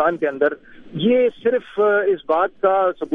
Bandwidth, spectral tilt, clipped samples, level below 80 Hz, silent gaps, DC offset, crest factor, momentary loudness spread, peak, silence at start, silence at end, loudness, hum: 3.9 kHz; -8 dB/octave; under 0.1%; -58 dBFS; none; under 0.1%; 16 dB; 5 LU; -4 dBFS; 0 s; 0 s; -19 LUFS; none